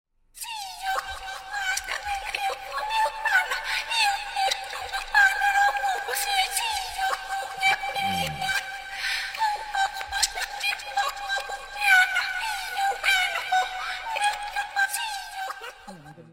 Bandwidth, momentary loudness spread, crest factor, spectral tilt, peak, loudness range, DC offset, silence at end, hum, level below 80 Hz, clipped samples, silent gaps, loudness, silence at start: 16.5 kHz; 12 LU; 20 dB; 0 dB/octave; -6 dBFS; 4 LU; under 0.1%; 0 s; none; -52 dBFS; under 0.1%; none; -25 LUFS; 0.35 s